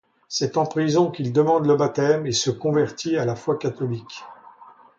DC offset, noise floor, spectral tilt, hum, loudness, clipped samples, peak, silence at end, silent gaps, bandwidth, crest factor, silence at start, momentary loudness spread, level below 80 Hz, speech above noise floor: under 0.1%; -48 dBFS; -5.5 dB/octave; none; -22 LUFS; under 0.1%; -6 dBFS; 0.35 s; none; 7.8 kHz; 16 dB; 0.3 s; 10 LU; -62 dBFS; 27 dB